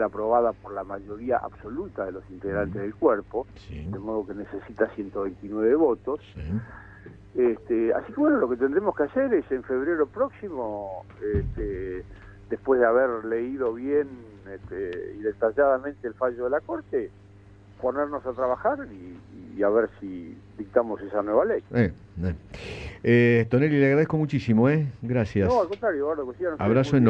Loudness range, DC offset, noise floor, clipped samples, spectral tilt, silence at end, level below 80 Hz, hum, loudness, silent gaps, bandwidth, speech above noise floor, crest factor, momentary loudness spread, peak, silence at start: 6 LU; under 0.1%; -50 dBFS; under 0.1%; -9 dB/octave; 0 s; -48 dBFS; none; -26 LUFS; none; 8 kHz; 25 dB; 20 dB; 16 LU; -6 dBFS; 0 s